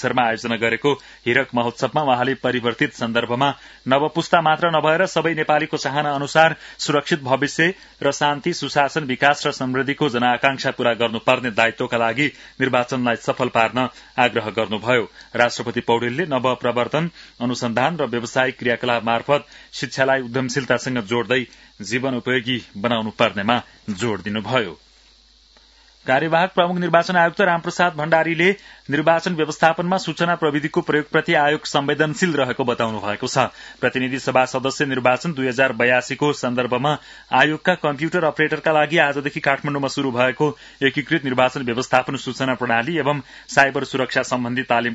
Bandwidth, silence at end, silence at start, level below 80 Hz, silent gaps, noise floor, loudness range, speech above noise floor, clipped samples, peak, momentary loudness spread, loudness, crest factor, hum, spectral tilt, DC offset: 8 kHz; 0 s; 0 s; -58 dBFS; none; -53 dBFS; 3 LU; 33 dB; under 0.1%; 0 dBFS; 6 LU; -20 LUFS; 20 dB; none; -4.5 dB/octave; under 0.1%